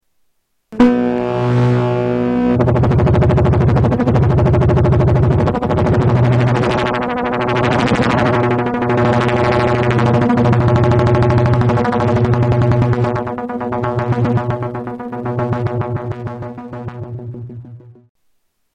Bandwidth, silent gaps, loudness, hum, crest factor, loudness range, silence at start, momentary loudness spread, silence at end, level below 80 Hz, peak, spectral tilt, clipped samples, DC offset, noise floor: 8.4 kHz; none; -15 LUFS; none; 12 dB; 8 LU; 0.7 s; 13 LU; 0.85 s; -30 dBFS; -2 dBFS; -8.5 dB/octave; under 0.1%; under 0.1%; -64 dBFS